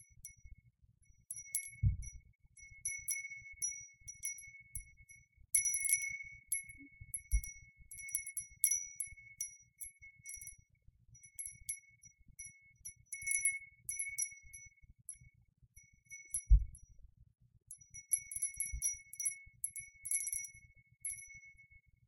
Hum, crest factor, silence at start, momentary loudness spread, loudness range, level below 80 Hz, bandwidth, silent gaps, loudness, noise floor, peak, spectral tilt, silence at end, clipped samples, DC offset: none; 28 dB; 0 s; 21 LU; 6 LU; -46 dBFS; 17 kHz; none; -39 LUFS; -69 dBFS; -14 dBFS; -1 dB/octave; 0.45 s; under 0.1%; under 0.1%